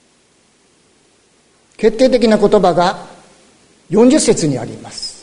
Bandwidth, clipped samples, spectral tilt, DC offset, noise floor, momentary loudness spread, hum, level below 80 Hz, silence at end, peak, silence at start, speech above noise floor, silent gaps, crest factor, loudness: 11 kHz; under 0.1%; -5 dB/octave; under 0.1%; -54 dBFS; 15 LU; none; -42 dBFS; 0.1 s; 0 dBFS; 1.8 s; 42 dB; none; 16 dB; -13 LUFS